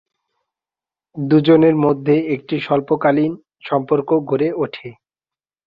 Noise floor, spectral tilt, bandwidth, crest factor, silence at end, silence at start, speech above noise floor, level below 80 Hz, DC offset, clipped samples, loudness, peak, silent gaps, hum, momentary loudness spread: under -90 dBFS; -10 dB/octave; 5.2 kHz; 16 dB; 0.75 s; 1.15 s; over 74 dB; -60 dBFS; under 0.1%; under 0.1%; -17 LUFS; -2 dBFS; none; none; 15 LU